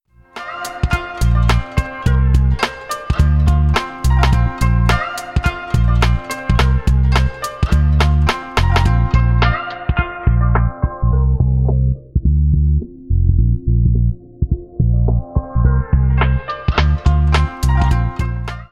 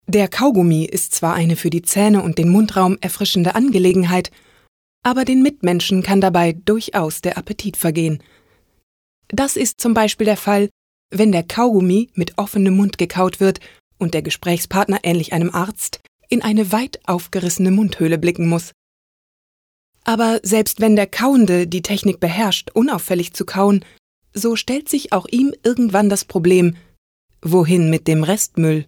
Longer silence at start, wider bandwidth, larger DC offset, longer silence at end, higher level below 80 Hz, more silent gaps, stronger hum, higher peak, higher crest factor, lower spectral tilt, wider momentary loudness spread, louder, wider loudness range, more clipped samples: first, 0.35 s vs 0.1 s; second, 12.5 kHz vs 20 kHz; neither; about the same, 0.05 s vs 0.05 s; first, -16 dBFS vs -50 dBFS; second, none vs 4.68-5.02 s, 8.83-9.22 s, 10.71-11.09 s, 13.80-13.91 s, 16.08-16.19 s, 18.74-19.93 s, 23.99-24.22 s, 26.98-27.28 s; neither; first, 0 dBFS vs -4 dBFS; about the same, 14 dB vs 14 dB; first, -6.5 dB/octave vs -5 dB/octave; about the same, 7 LU vs 8 LU; about the same, -16 LUFS vs -17 LUFS; second, 1 LU vs 4 LU; neither